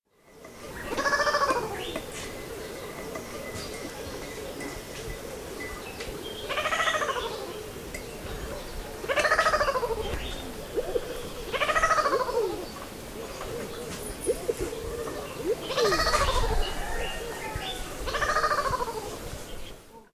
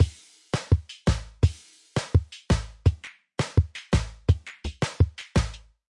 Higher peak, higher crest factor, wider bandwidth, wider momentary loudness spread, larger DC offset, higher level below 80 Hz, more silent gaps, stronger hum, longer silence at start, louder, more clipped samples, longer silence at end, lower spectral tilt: about the same, -10 dBFS vs -8 dBFS; about the same, 20 dB vs 18 dB; first, 16 kHz vs 11 kHz; first, 14 LU vs 8 LU; neither; second, -42 dBFS vs -34 dBFS; neither; neither; first, 0.3 s vs 0 s; second, -30 LUFS vs -27 LUFS; neither; second, 0.1 s vs 0.3 s; second, -3 dB/octave vs -6 dB/octave